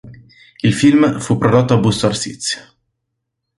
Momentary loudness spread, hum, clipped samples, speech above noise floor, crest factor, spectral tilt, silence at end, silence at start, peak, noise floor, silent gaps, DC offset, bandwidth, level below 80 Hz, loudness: 10 LU; none; under 0.1%; 61 dB; 16 dB; -5.5 dB/octave; 1 s; 0.05 s; 0 dBFS; -75 dBFS; none; under 0.1%; 11.5 kHz; -46 dBFS; -15 LUFS